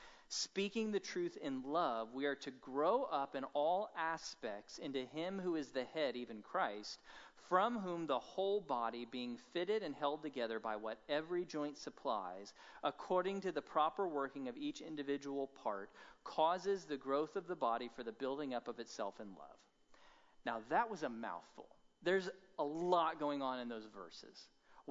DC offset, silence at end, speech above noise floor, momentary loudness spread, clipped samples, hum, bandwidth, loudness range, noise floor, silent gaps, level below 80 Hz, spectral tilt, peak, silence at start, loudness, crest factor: under 0.1%; 0 s; 25 dB; 12 LU; under 0.1%; none; 7.6 kHz; 4 LU; -66 dBFS; none; -80 dBFS; -3 dB/octave; -20 dBFS; 0 s; -41 LUFS; 22 dB